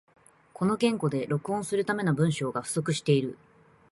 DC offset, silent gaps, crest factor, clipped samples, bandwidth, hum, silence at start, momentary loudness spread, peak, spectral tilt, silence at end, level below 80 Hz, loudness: under 0.1%; none; 16 dB; under 0.1%; 11.5 kHz; none; 0.6 s; 5 LU; -12 dBFS; -6 dB/octave; 0.55 s; -66 dBFS; -28 LUFS